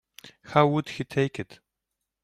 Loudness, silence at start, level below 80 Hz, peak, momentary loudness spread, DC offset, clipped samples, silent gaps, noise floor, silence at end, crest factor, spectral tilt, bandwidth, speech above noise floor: -25 LUFS; 0.25 s; -64 dBFS; -6 dBFS; 15 LU; under 0.1%; under 0.1%; none; -84 dBFS; 0.7 s; 22 dB; -7 dB/octave; 14 kHz; 59 dB